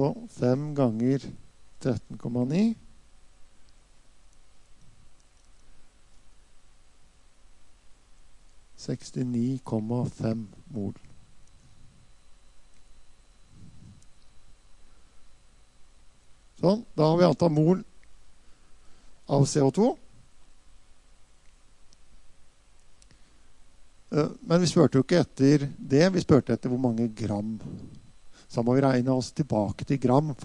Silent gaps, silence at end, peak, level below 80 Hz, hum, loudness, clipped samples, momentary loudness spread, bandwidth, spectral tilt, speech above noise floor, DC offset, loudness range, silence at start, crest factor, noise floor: none; 0 s; -6 dBFS; -56 dBFS; none; -26 LUFS; under 0.1%; 14 LU; 11 kHz; -7 dB/octave; 28 dB; under 0.1%; 13 LU; 0 s; 22 dB; -53 dBFS